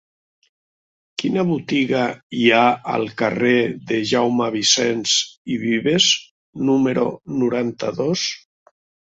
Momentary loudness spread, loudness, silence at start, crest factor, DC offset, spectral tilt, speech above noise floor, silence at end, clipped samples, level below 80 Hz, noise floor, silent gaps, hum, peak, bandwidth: 9 LU; -19 LUFS; 1.2 s; 18 dB; under 0.1%; -3.5 dB/octave; over 71 dB; 0.8 s; under 0.1%; -62 dBFS; under -90 dBFS; 2.23-2.30 s, 5.38-5.45 s, 6.31-6.53 s; none; -2 dBFS; 8 kHz